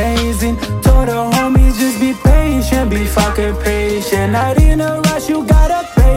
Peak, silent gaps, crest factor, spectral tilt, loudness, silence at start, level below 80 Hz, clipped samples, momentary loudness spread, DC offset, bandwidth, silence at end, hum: 0 dBFS; none; 12 dB; -6 dB/octave; -14 LUFS; 0 s; -14 dBFS; under 0.1%; 4 LU; under 0.1%; 16.5 kHz; 0 s; none